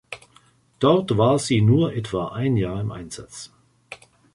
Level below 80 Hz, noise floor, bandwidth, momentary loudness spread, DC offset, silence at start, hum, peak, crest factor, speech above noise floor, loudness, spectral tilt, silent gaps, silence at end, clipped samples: -50 dBFS; -57 dBFS; 11.5 kHz; 23 LU; under 0.1%; 0.1 s; none; -4 dBFS; 18 dB; 36 dB; -21 LUFS; -6.5 dB/octave; none; 0.4 s; under 0.1%